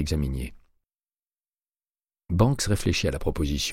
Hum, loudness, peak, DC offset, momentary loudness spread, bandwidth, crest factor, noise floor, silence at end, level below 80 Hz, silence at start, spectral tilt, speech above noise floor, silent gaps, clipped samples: none; -26 LUFS; -8 dBFS; under 0.1%; 9 LU; 16 kHz; 20 dB; under -90 dBFS; 0 s; -36 dBFS; 0 s; -5 dB/octave; over 65 dB; 1.48-1.52 s, 1.90-1.94 s; under 0.1%